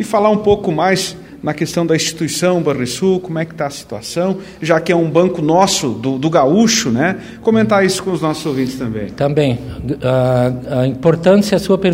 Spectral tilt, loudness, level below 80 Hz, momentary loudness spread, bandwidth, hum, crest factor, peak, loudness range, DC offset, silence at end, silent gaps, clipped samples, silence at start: -5 dB/octave; -15 LUFS; -44 dBFS; 10 LU; 16 kHz; none; 14 dB; 0 dBFS; 4 LU; under 0.1%; 0 s; none; under 0.1%; 0 s